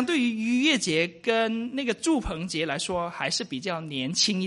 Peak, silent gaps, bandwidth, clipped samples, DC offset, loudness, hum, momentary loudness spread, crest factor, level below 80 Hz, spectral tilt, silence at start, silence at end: -10 dBFS; none; 11.5 kHz; under 0.1%; under 0.1%; -26 LUFS; none; 8 LU; 16 dB; -50 dBFS; -3.5 dB/octave; 0 s; 0 s